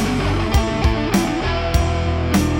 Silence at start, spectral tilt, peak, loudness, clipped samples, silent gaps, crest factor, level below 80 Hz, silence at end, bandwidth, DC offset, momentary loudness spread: 0 s; -5.5 dB/octave; -2 dBFS; -19 LUFS; under 0.1%; none; 16 dB; -24 dBFS; 0 s; 18.5 kHz; under 0.1%; 2 LU